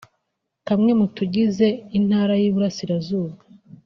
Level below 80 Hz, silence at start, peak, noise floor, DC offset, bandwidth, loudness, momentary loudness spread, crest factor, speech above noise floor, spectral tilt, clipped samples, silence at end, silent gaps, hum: -60 dBFS; 0.65 s; -6 dBFS; -77 dBFS; under 0.1%; 6.6 kHz; -20 LUFS; 8 LU; 16 dB; 57 dB; -7 dB/octave; under 0.1%; 0.5 s; none; none